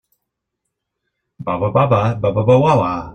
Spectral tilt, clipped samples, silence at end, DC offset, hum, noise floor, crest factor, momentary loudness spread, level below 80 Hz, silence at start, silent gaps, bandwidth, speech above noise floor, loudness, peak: -8.5 dB/octave; under 0.1%; 0 s; under 0.1%; none; -77 dBFS; 16 dB; 10 LU; -46 dBFS; 1.4 s; none; 8.8 kHz; 63 dB; -15 LUFS; 0 dBFS